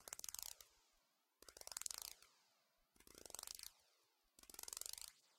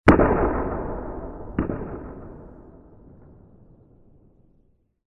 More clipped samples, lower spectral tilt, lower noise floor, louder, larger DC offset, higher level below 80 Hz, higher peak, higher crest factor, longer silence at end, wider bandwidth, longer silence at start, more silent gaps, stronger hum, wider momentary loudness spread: neither; second, 1 dB/octave vs -8.5 dB/octave; first, -83 dBFS vs -62 dBFS; second, -52 LUFS vs -25 LUFS; neither; second, -82 dBFS vs -36 dBFS; second, -20 dBFS vs -4 dBFS; first, 38 dB vs 22 dB; second, 0 s vs 2.45 s; first, 17 kHz vs 10.5 kHz; about the same, 0 s vs 0.05 s; neither; neither; second, 16 LU vs 25 LU